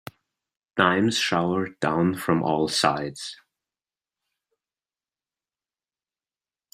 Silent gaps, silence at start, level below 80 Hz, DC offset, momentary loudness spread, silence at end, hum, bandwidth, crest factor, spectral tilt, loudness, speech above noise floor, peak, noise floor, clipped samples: none; 0.75 s; -64 dBFS; under 0.1%; 11 LU; 3.4 s; none; 16 kHz; 26 dB; -4.5 dB/octave; -23 LUFS; over 67 dB; -2 dBFS; under -90 dBFS; under 0.1%